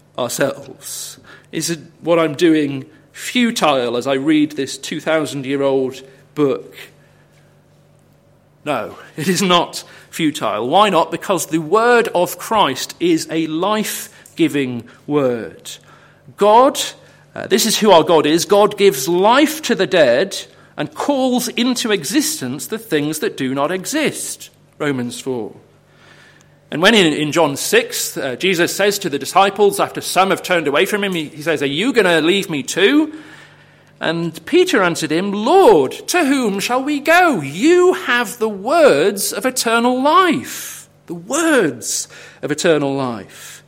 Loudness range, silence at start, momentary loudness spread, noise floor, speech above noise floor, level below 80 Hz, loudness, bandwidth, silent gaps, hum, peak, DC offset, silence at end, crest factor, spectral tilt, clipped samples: 7 LU; 0.2 s; 15 LU; -52 dBFS; 36 dB; -60 dBFS; -16 LUFS; 16.5 kHz; none; 50 Hz at -55 dBFS; 0 dBFS; under 0.1%; 0.1 s; 16 dB; -3.5 dB/octave; under 0.1%